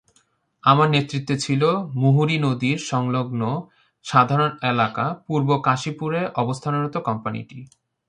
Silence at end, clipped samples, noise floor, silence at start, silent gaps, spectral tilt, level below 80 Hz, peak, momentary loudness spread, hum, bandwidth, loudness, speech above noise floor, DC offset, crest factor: 0.45 s; under 0.1%; -64 dBFS; 0.65 s; none; -6 dB/octave; -62 dBFS; -2 dBFS; 9 LU; none; 10 kHz; -21 LUFS; 43 dB; under 0.1%; 20 dB